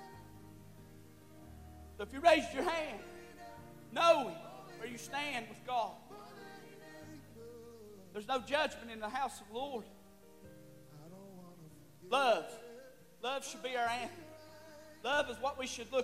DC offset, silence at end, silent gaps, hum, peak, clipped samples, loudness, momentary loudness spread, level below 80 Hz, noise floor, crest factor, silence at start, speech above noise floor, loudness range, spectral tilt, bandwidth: under 0.1%; 0 s; none; none; -14 dBFS; under 0.1%; -36 LUFS; 25 LU; -66 dBFS; -59 dBFS; 24 dB; 0 s; 24 dB; 9 LU; -3 dB/octave; 16 kHz